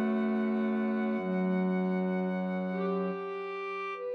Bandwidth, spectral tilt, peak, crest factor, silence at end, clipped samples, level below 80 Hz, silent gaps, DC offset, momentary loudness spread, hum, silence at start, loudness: 5 kHz; -9.5 dB/octave; -20 dBFS; 10 dB; 0 s; under 0.1%; -84 dBFS; none; under 0.1%; 6 LU; none; 0 s; -32 LUFS